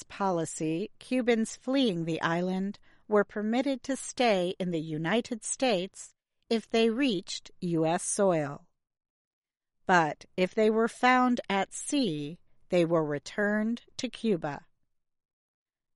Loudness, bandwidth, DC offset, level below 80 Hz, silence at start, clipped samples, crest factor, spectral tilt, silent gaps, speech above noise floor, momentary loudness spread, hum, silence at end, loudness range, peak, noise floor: -29 LUFS; 11.5 kHz; under 0.1%; -66 dBFS; 0 s; under 0.1%; 20 dB; -4.5 dB/octave; 9.10-9.42 s; 46 dB; 11 LU; none; 1.35 s; 3 LU; -8 dBFS; -75 dBFS